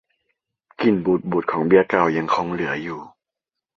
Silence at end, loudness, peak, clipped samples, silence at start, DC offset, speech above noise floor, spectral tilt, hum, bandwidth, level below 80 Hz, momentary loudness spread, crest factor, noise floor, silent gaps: 0.7 s; -20 LUFS; -2 dBFS; under 0.1%; 0.8 s; under 0.1%; 66 dB; -7.5 dB/octave; none; 7.2 kHz; -58 dBFS; 10 LU; 20 dB; -85 dBFS; none